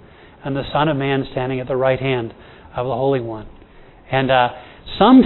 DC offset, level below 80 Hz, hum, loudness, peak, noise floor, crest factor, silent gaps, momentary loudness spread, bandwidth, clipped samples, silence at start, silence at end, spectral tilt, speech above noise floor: under 0.1%; -44 dBFS; none; -19 LUFS; 0 dBFS; -44 dBFS; 18 dB; none; 15 LU; 4.2 kHz; under 0.1%; 0.45 s; 0 s; -10.5 dB/octave; 27 dB